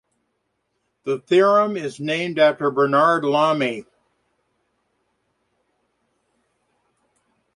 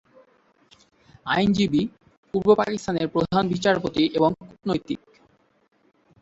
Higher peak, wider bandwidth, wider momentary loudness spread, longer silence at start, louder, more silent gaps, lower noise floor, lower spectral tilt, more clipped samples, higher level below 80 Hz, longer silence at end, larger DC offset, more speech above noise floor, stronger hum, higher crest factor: about the same, -4 dBFS vs -4 dBFS; first, 11 kHz vs 8 kHz; about the same, 12 LU vs 12 LU; second, 1.05 s vs 1.25 s; first, -19 LUFS vs -23 LUFS; second, none vs 2.17-2.23 s; first, -73 dBFS vs -61 dBFS; about the same, -5.5 dB/octave vs -6 dB/octave; neither; second, -70 dBFS vs -54 dBFS; first, 3.75 s vs 1.25 s; neither; first, 55 dB vs 39 dB; neither; about the same, 20 dB vs 20 dB